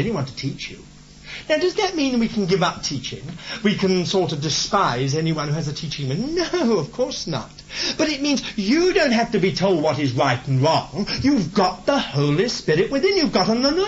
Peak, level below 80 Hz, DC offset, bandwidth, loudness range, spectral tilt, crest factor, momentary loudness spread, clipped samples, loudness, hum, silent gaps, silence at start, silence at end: -4 dBFS; -46 dBFS; under 0.1%; 8 kHz; 4 LU; -5 dB/octave; 16 dB; 9 LU; under 0.1%; -21 LUFS; none; none; 0 s; 0 s